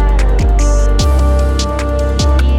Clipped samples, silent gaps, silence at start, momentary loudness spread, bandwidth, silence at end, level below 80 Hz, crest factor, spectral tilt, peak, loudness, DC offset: under 0.1%; none; 0 s; 3 LU; 11.5 kHz; 0 s; -10 dBFS; 10 dB; -5.5 dB/octave; -2 dBFS; -13 LUFS; under 0.1%